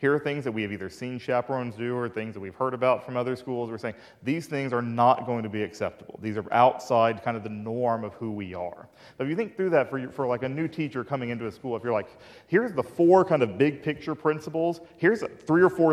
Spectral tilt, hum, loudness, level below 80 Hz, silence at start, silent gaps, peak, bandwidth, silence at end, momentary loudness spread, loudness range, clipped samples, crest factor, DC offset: -7.5 dB/octave; none; -27 LUFS; -66 dBFS; 0 s; none; -6 dBFS; 13 kHz; 0 s; 12 LU; 5 LU; under 0.1%; 20 dB; under 0.1%